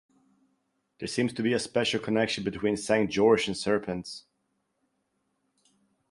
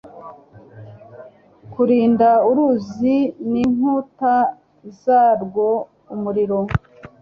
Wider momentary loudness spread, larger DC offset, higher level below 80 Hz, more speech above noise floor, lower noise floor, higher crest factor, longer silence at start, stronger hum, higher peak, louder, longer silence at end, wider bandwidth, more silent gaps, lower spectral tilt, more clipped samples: about the same, 13 LU vs 12 LU; neither; second, -62 dBFS vs -46 dBFS; first, 50 dB vs 26 dB; first, -77 dBFS vs -43 dBFS; about the same, 20 dB vs 16 dB; first, 1 s vs 0.05 s; neither; second, -10 dBFS vs -2 dBFS; second, -27 LUFS vs -18 LUFS; first, 1.9 s vs 0.15 s; first, 11.5 kHz vs 6.8 kHz; neither; second, -4.5 dB/octave vs -9 dB/octave; neither